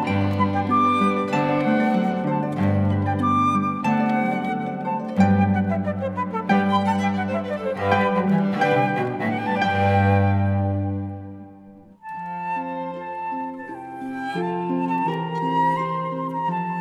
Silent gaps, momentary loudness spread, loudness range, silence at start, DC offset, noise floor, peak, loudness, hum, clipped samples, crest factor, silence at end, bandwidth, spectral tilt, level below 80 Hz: none; 11 LU; 8 LU; 0 s; under 0.1%; -46 dBFS; -4 dBFS; -22 LUFS; none; under 0.1%; 18 dB; 0 s; 9.4 kHz; -8 dB/octave; -64 dBFS